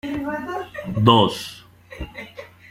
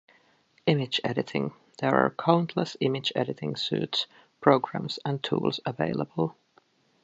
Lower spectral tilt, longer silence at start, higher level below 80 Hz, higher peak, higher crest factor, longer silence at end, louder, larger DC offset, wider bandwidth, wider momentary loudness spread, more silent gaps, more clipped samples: about the same, -6 dB/octave vs -6.5 dB/octave; second, 0.05 s vs 0.65 s; first, -46 dBFS vs -68 dBFS; about the same, -2 dBFS vs -2 dBFS; about the same, 22 dB vs 26 dB; second, 0.05 s vs 0.7 s; first, -20 LUFS vs -28 LUFS; neither; first, 16 kHz vs 8 kHz; first, 22 LU vs 8 LU; neither; neither